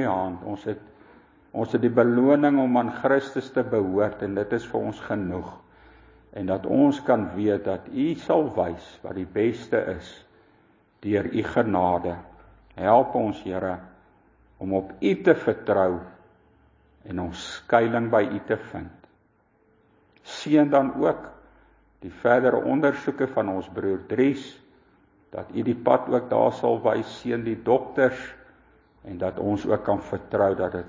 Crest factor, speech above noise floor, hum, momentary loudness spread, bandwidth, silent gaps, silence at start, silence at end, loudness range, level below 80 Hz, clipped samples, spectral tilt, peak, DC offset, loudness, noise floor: 22 dB; 40 dB; none; 16 LU; 7.6 kHz; none; 0 s; 0 s; 4 LU; -54 dBFS; under 0.1%; -7.5 dB/octave; -4 dBFS; under 0.1%; -24 LUFS; -64 dBFS